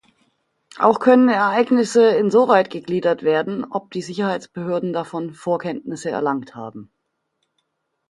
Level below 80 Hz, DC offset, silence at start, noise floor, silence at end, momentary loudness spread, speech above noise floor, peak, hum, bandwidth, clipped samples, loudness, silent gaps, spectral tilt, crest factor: -68 dBFS; under 0.1%; 0.75 s; -74 dBFS; 1.25 s; 14 LU; 55 dB; 0 dBFS; none; 11.5 kHz; under 0.1%; -19 LUFS; none; -6 dB/octave; 20 dB